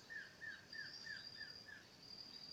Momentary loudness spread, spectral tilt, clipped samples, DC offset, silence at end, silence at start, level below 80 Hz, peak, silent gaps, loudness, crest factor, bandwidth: 6 LU; -1.5 dB/octave; under 0.1%; under 0.1%; 0 s; 0 s; -82 dBFS; -40 dBFS; none; -52 LUFS; 14 dB; 16.5 kHz